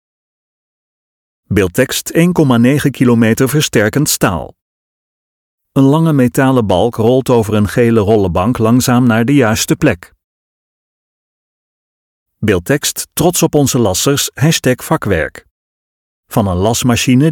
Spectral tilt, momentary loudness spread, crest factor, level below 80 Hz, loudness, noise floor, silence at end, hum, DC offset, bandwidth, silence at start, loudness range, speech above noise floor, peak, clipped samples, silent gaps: -5 dB/octave; 6 LU; 14 dB; -40 dBFS; -12 LUFS; under -90 dBFS; 0 s; none; under 0.1%; 19 kHz; 1.5 s; 5 LU; over 79 dB; 0 dBFS; under 0.1%; 4.61-5.58 s, 10.24-12.26 s, 15.51-16.23 s